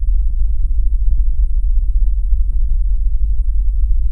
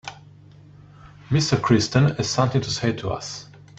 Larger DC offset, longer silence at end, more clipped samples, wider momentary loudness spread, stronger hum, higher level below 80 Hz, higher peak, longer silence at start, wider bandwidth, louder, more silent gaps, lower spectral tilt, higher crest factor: neither; second, 0 s vs 0.35 s; neither; second, 1 LU vs 14 LU; neither; first, -14 dBFS vs -50 dBFS; about the same, -2 dBFS vs -4 dBFS; about the same, 0 s vs 0.05 s; second, 0.4 kHz vs 8.4 kHz; about the same, -20 LUFS vs -22 LUFS; neither; first, -11 dB/octave vs -5.5 dB/octave; second, 10 dB vs 20 dB